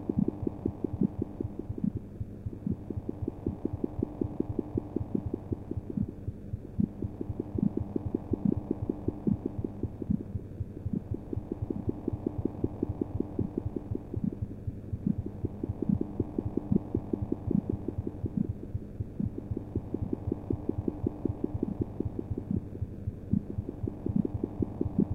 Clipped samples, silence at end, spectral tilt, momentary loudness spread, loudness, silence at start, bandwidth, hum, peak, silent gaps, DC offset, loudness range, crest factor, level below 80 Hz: under 0.1%; 0 s; -12 dB/octave; 7 LU; -35 LUFS; 0 s; 3.9 kHz; none; -14 dBFS; none; under 0.1%; 3 LU; 20 dB; -46 dBFS